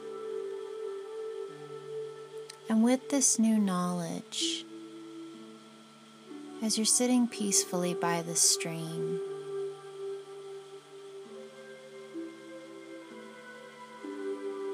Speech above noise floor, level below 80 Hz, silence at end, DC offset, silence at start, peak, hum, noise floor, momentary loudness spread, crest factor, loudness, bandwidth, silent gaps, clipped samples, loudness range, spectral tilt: 25 dB; under -90 dBFS; 0 s; under 0.1%; 0 s; -12 dBFS; none; -54 dBFS; 22 LU; 22 dB; -30 LUFS; 15.5 kHz; none; under 0.1%; 17 LU; -3 dB/octave